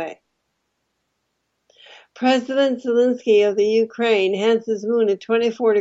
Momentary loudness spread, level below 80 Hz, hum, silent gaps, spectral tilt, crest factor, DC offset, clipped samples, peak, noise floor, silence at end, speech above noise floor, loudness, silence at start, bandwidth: 4 LU; -76 dBFS; none; none; -5 dB/octave; 14 dB; under 0.1%; under 0.1%; -6 dBFS; -73 dBFS; 0 s; 55 dB; -19 LUFS; 0 s; 8 kHz